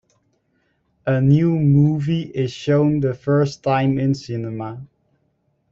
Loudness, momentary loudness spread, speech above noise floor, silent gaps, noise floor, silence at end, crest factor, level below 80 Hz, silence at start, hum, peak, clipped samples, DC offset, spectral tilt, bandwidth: -19 LUFS; 13 LU; 48 dB; none; -66 dBFS; 0.85 s; 16 dB; -54 dBFS; 1.05 s; none; -4 dBFS; under 0.1%; under 0.1%; -8.5 dB/octave; 7.4 kHz